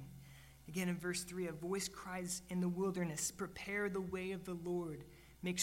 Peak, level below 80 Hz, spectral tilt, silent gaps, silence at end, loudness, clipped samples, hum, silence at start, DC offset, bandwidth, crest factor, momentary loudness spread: -22 dBFS; -66 dBFS; -4.5 dB/octave; none; 0 s; -42 LUFS; under 0.1%; none; 0 s; under 0.1%; 16 kHz; 20 dB; 13 LU